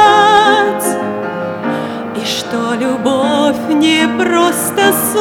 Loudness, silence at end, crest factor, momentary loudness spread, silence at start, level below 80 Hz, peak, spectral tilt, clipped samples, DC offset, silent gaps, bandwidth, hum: -13 LUFS; 0 s; 12 dB; 11 LU; 0 s; -56 dBFS; 0 dBFS; -3 dB/octave; 0.1%; under 0.1%; none; over 20 kHz; none